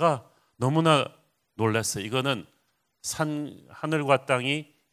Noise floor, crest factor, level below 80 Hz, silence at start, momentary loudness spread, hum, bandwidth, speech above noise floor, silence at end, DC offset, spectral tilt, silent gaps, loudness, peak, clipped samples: -72 dBFS; 22 dB; -64 dBFS; 0 s; 13 LU; none; 16 kHz; 46 dB; 0.3 s; under 0.1%; -4.5 dB/octave; none; -27 LUFS; -6 dBFS; under 0.1%